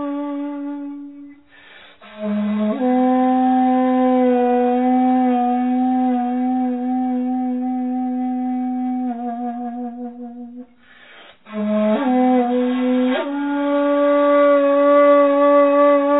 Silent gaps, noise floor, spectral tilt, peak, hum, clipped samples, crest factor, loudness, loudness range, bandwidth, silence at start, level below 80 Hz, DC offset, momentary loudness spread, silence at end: none; -47 dBFS; -10.5 dB/octave; -4 dBFS; none; under 0.1%; 14 dB; -17 LUFS; 9 LU; 4 kHz; 0 s; -72 dBFS; 0.2%; 15 LU; 0 s